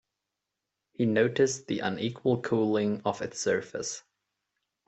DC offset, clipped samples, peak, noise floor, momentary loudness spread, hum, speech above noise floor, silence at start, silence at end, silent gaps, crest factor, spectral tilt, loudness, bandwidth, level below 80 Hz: under 0.1%; under 0.1%; -12 dBFS; -86 dBFS; 9 LU; none; 58 dB; 1 s; 0.85 s; none; 18 dB; -5 dB/octave; -29 LUFS; 8.4 kHz; -70 dBFS